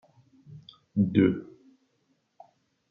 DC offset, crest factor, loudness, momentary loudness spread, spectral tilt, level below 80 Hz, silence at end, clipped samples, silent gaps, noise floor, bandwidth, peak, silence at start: under 0.1%; 24 dB; -26 LUFS; 26 LU; -10.5 dB/octave; -70 dBFS; 1.5 s; under 0.1%; none; -73 dBFS; 5 kHz; -8 dBFS; 0.5 s